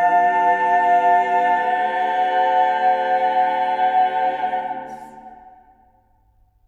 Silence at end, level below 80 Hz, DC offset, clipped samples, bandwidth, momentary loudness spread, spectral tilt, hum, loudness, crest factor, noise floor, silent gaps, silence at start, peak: 1.2 s; -64 dBFS; under 0.1%; under 0.1%; 7.6 kHz; 8 LU; -4 dB/octave; 50 Hz at -75 dBFS; -18 LUFS; 12 dB; -58 dBFS; none; 0 s; -6 dBFS